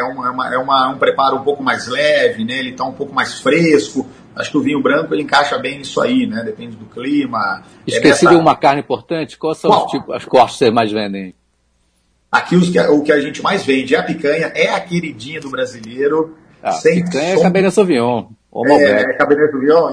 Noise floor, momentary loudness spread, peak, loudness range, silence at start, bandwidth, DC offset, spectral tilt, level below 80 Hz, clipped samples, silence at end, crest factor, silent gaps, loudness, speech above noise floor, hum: -60 dBFS; 11 LU; 0 dBFS; 4 LU; 0 s; 10.5 kHz; under 0.1%; -5.5 dB/octave; -54 dBFS; under 0.1%; 0 s; 14 dB; none; -15 LUFS; 46 dB; none